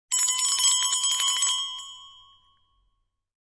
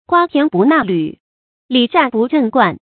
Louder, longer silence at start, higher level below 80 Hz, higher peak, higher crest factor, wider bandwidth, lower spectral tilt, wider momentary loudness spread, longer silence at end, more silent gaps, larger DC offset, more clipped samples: second, -21 LUFS vs -14 LUFS; about the same, 0.1 s vs 0.1 s; second, -68 dBFS vs -58 dBFS; second, -10 dBFS vs 0 dBFS; about the same, 18 dB vs 14 dB; first, 11 kHz vs 4.5 kHz; second, 6 dB/octave vs -9 dB/octave; first, 14 LU vs 6 LU; first, 1.3 s vs 0.25 s; second, none vs 1.20-1.69 s; neither; neither